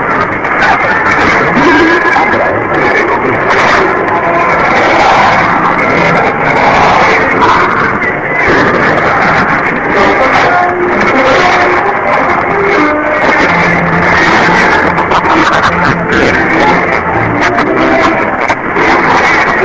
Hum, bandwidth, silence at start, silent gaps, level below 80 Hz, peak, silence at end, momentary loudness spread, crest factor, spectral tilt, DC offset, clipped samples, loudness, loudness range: none; 8 kHz; 0 s; none; -32 dBFS; 0 dBFS; 0 s; 4 LU; 8 dB; -5.5 dB/octave; 0.5%; 0.4%; -7 LUFS; 1 LU